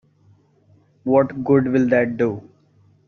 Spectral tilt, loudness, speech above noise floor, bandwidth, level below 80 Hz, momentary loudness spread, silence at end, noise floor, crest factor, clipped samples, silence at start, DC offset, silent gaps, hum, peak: -8.5 dB/octave; -19 LUFS; 38 dB; 6.6 kHz; -58 dBFS; 10 LU; 0.65 s; -56 dBFS; 18 dB; under 0.1%; 1.05 s; under 0.1%; none; none; -2 dBFS